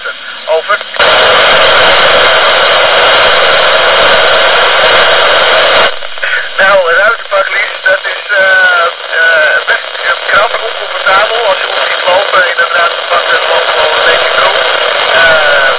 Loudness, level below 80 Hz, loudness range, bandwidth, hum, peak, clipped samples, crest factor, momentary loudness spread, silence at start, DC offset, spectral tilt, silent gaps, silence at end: -6 LUFS; -42 dBFS; 4 LU; 4 kHz; none; 0 dBFS; 0.7%; 8 dB; 7 LU; 0 s; under 0.1%; -5 dB/octave; none; 0 s